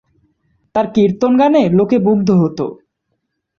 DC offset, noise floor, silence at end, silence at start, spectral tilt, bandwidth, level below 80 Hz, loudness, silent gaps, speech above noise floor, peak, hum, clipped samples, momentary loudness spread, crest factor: under 0.1%; -71 dBFS; 0.85 s; 0.75 s; -8.5 dB/octave; 7 kHz; -52 dBFS; -14 LUFS; none; 58 dB; -2 dBFS; none; under 0.1%; 10 LU; 12 dB